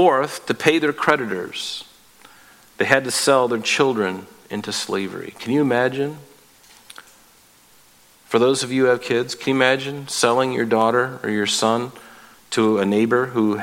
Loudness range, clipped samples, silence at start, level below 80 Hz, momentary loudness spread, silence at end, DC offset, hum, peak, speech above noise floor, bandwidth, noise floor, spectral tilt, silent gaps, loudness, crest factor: 6 LU; under 0.1%; 0 s; -66 dBFS; 10 LU; 0 s; under 0.1%; none; 0 dBFS; 33 dB; 16.5 kHz; -52 dBFS; -4 dB/octave; none; -20 LUFS; 20 dB